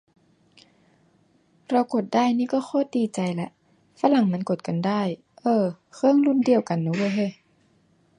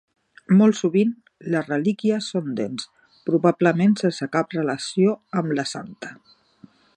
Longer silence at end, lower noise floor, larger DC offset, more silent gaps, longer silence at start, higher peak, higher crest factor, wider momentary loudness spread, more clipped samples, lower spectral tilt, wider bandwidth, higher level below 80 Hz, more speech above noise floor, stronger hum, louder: about the same, 0.85 s vs 0.8 s; first, -62 dBFS vs -52 dBFS; neither; neither; first, 1.7 s vs 0.5 s; about the same, -4 dBFS vs -4 dBFS; about the same, 20 dB vs 18 dB; second, 9 LU vs 15 LU; neither; about the same, -7 dB/octave vs -6.5 dB/octave; about the same, 10.5 kHz vs 10 kHz; about the same, -72 dBFS vs -72 dBFS; first, 40 dB vs 31 dB; neither; about the same, -24 LUFS vs -22 LUFS